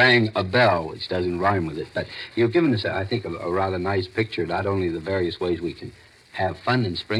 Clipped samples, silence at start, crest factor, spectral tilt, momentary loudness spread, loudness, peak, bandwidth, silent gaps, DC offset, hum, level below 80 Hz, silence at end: under 0.1%; 0 s; 18 dB; -7 dB/octave; 11 LU; -24 LUFS; -4 dBFS; 11 kHz; none; under 0.1%; none; -54 dBFS; 0 s